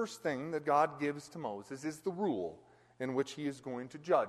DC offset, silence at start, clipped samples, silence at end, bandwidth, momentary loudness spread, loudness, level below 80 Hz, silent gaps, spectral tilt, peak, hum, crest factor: under 0.1%; 0 s; under 0.1%; 0 s; 13 kHz; 12 LU; -37 LUFS; -78 dBFS; none; -5.5 dB/octave; -18 dBFS; none; 18 dB